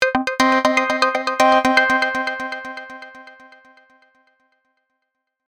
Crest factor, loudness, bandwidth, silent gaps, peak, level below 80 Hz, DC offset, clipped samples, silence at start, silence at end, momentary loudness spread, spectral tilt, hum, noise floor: 20 dB; -17 LUFS; 18 kHz; none; 0 dBFS; -58 dBFS; under 0.1%; under 0.1%; 0 s; 2.15 s; 19 LU; -2.5 dB/octave; none; -77 dBFS